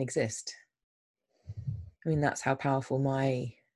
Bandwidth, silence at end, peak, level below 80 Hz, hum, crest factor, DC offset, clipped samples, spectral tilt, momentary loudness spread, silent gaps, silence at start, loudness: 12 kHz; 0.25 s; -14 dBFS; -58 dBFS; none; 20 dB; under 0.1%; under 0.1%; -6 dB/octave; 13 LU; 0.84-1.14 s; 0 s; -32 LUFS